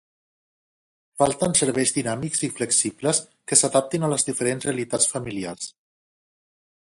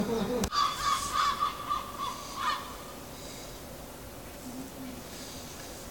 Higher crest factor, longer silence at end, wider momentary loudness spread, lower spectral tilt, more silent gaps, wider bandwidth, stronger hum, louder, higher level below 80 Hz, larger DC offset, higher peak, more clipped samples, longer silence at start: about the same, 24 dB vs 26 dB; first, 1.25 s vs 0 s; second, 12 LU vs 15 LU; about the same, -3 dB/octave vs -3 dB/octave; neither; second, 11.5 kHz vs 18 kHz; neither; first, -22 LUFS vs -33 LUFS; second, -60 dBFS vs -52 dBFS; second, under 0.1% vs 0.1%; first, -2 dBFS vs -8 dBFS; neither; first, 1.15 s vs 0 s